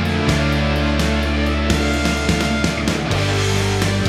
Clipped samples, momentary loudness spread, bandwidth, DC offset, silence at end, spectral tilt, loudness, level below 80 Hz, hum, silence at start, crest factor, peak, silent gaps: under 0.1%; 2 LU; 15 kHz; under 0.1%; 0 s; -5 dB/octave; -18 LUFS; -24 dBFS; none; 0 s; 14 dB; -2 dBFS; none